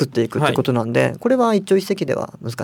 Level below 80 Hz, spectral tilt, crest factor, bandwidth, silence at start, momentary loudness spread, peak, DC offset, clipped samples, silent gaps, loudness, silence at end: -58 dBFS; -6.5 dB/octave; 16 dB; 18 kHz; 0 s; 7 LU; -2 dBFS; under 0.1%; under 0.1%; none; -19 LUFS; 0 s